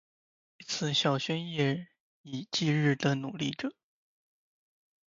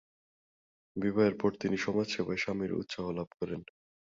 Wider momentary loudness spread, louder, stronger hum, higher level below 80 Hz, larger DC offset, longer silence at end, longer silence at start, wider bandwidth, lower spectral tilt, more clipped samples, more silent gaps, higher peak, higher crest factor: about the same, 12 LU vs 11 LU; about the same, -31 LUFS vs -33 LUFS; neither; second, -74 dBFS vs -64 dBFS; neither; first, 1.35 s vs 0.55 s; second, 0.6 s vs 0.95 s; about the same, 7.6 kHz vs 7.8 kHz; about the same, -5 dB/octave vs -6 dB/octave; neither; first, 2.00-2.24 s vs 3.27-3.31 s; about the same, -12 dBFS vs -14 dBFS; about the same, 20 dB vs 20 dB